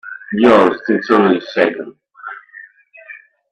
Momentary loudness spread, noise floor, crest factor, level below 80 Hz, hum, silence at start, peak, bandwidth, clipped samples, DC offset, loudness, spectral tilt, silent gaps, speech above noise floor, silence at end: 23 LU; -42 dBFS; 16 dB; -56 dBFS; none; 0.05 s; 0 dBFS; 9 kHz; under 0.1%; under 0.1%; -13 LUFS; -7 dB/octave; none; 28 dB; 0.35 s